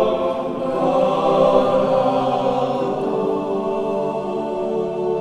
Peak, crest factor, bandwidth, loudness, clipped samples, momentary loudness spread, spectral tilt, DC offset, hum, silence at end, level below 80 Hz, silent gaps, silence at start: -2 dBFS; 16 dB; 10.5 kHz; -19 LUFS; under 0.1%; 7 LU; -7 dB/octave; under 0.1%; none; 0 s; -50 dBFS; none; 0 s